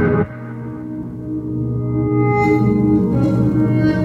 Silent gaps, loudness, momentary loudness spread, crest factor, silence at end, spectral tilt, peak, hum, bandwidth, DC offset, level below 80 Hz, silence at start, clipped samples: none; -17 LUFS; 13 LU; 12 dB; 0 s; -10 dB/octave; -4 dBFS; none; 7 kHz; under 0.1%; -36 dBFS; 0 s; under 0.1%